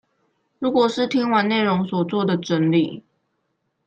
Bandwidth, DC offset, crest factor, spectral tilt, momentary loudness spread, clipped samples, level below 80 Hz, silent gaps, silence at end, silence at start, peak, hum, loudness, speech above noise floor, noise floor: 8.6 kHz; under 0.1%; 18 dB; -6.5 dB/octave; 6 LU; under 0.1%; -66 dBFS; none; 0.85 s; 0.6 s; -4 dBFS; none; -20 LUFS; 53 dB; -73 dBFS